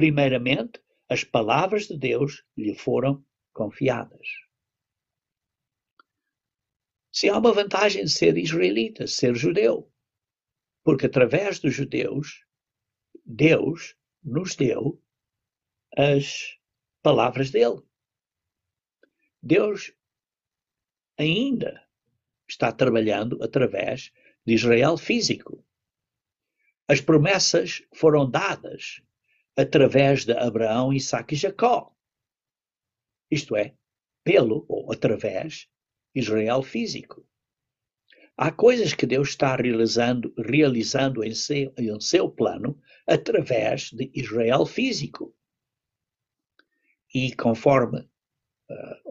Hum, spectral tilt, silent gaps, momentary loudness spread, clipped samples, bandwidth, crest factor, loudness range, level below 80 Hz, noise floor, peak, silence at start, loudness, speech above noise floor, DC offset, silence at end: none; -5 dB/octave; 5.92-5.97 s; 14 LU; under 0.1%; 8 kHz; 20 dB; 6 LU; -60 dBFS; under -90 dBFS; -4 dBFS; 0 s; -23 LUFS; over 68 dB; under 0.1%; 0 s